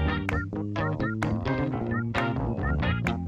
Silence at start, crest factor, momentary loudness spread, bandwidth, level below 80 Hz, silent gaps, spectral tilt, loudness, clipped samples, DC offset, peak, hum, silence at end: 0 s; 16 dB; 3 LU; 11.5 kHz; -38 dBFS; none; -7.5 dB/octave; -28 LUFS; under 0.1%; under 0.1%; -12 dBFS; none; 0 s